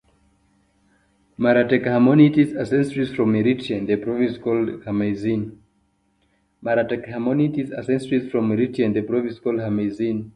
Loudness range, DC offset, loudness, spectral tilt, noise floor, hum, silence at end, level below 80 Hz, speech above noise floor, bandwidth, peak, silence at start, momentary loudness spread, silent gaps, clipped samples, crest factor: 6 LU; under 0.1%; -21 LUFS; -8.5 dB/octave; -65 dBFS; none; 0.05 s; -56 dBFS; 45 dB; 10.5 kHz; -2 dBFS; 1.4 s; 9 LU; none; under 0.1%; 20 dB